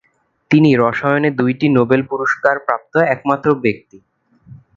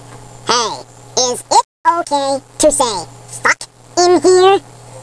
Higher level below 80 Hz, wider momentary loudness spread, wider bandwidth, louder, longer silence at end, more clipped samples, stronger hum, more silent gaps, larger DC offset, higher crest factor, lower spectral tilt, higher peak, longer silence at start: second, -56 dBFS vs -46 dBFS; second, 6 LU vs 12 LU; second, 7.4 kHz vs 11 kHz; about the same, -15 LUFS vs -14 LUFS; first, 0.2 s vs 0 s; neither; neither; second, none vs 1.65-1.84 s; second, under 0.1% vs 0.2%; about the same, 16 dB vs 12 dB; first, -8 dB/octave vs -2 dB/octave; about the same, 0 dBFS vs -2 dBFS; first, 0.5 s vs 0 s